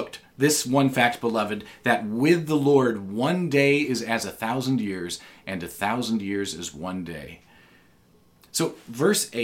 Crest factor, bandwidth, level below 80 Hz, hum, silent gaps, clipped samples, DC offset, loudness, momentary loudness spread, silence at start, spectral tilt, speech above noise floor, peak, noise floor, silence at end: 22 dB; 17 kHz; -62 dBFS; none; none; under 0.1%; under 0.1%; -24 LUFS; 13 LU; 0 s; -4.5 dB/octave; 34 dB; -4 dBFS; -58 dBFS; 0 s